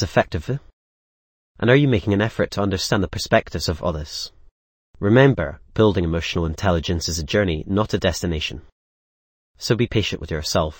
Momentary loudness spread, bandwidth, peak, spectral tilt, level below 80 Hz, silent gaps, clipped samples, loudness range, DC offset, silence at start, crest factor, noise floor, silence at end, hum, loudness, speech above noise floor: 11 LU; 17 kHz; 0 dBFS; -5.5 dB/octave; -38 dBFS; 0.73-1.55 s, 4.51-4.94 s, 8.72-9.54 s; under 0.1%; 3 LU; under 0.1%; 0 s; 20 dB; under -90 dBFS; 0.05 s; none; -21 LUFS; over 70 dB